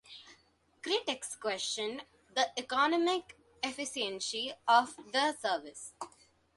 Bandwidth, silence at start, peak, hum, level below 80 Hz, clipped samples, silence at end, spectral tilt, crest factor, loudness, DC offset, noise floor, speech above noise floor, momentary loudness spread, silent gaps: 11.5 kHz; 0.1 s; -14 dBFS; none; -76 dBFS; under 0.1%; 0.5 s; -1 dB/octave; 20 dB; -33 LUFS; under 0.1%; -68 dBFS; 35 dB; 18 LU; none